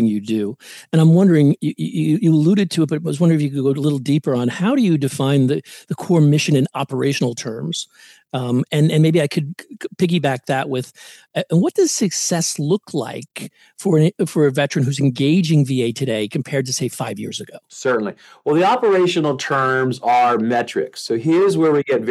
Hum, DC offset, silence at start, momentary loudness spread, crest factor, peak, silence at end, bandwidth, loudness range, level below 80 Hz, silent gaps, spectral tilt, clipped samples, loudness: none; under 0.1%; 0 s; 12 LU; 14 dB; -4 dBFS; 0 s; 12.5 kHz; 3 LU; -68 dBFS; none; -6 dB/octave; under 0.1%; -18 LUFS